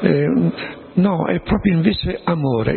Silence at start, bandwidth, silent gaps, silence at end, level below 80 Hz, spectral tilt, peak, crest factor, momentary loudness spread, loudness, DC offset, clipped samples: 0 s; 4.4 kHz; none; 0 s; -36 dBFS; -12.5 dB/octave; 0 dBFS; 18 dB; 6 LU; -18 LUFS; under 0.1%; under 0.1%